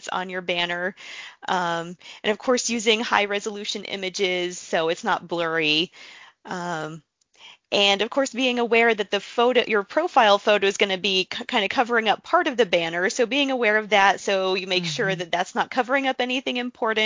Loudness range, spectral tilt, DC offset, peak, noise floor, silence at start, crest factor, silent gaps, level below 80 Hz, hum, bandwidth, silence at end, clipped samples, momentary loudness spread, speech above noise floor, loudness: 5 LU; -3 dB/octave; under 0.1%; -2 dBFS; -50 dBFS; 0.05 s; 22 dB; none; -68 dBFS; none; 7.8 kHz; 0 s; under 0.1%; 10 LU; 28 dB; -22 LUFS